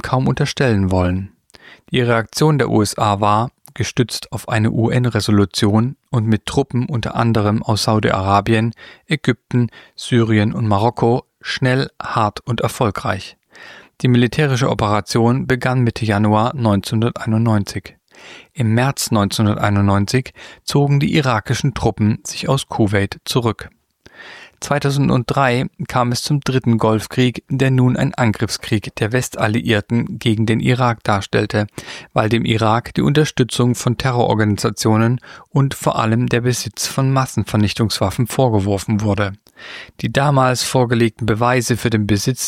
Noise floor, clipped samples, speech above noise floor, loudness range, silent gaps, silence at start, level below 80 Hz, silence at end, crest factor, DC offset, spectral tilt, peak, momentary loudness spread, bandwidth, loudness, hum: -44 dBFS; under 0.1%; 27 dB; 2 LU; none; 0.05 s; -44 dBFS; 0 s; 16 dB; under 0.1%; -6 dB/octave; 0 dBFS; 7 LU; 15.5 kHz; -17 LUFS; none